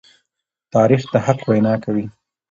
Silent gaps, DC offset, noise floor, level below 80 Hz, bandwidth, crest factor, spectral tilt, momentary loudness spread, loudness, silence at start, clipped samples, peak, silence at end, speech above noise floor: none; under 0.1%; -79 dBFS; -56 dBFS; 7.6 kHz; 18 dB; -8 dB/octave; 9 LU; -18 LUFS; 0.75 s; under 0.1%; 0 dBFS; 0.4 s; 63 dB